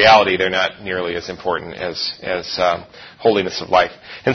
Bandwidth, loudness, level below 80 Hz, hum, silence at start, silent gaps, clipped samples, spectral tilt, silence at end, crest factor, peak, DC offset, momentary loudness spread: 6.6 kHz; -19 LUFS; -50 dBFS; none; 0 s; none; under 0.1%; -4 dB/octave; 0 s; 18 dB; 0 dBFS; under 0.1%; 8 LU